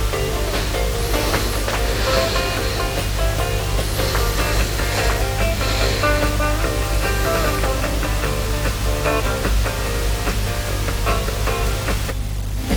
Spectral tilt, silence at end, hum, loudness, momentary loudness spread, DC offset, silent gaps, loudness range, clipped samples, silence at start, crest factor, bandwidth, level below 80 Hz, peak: -4 dB/octave; 0 s; 50 Hz at -25 dBFS; -20 LUFS; 4 LU; under 0.1%; none; 2 LU; under 0.1%; 0 s; 16 dB; over 20 kHz; -22 dBFS; -4 dBFS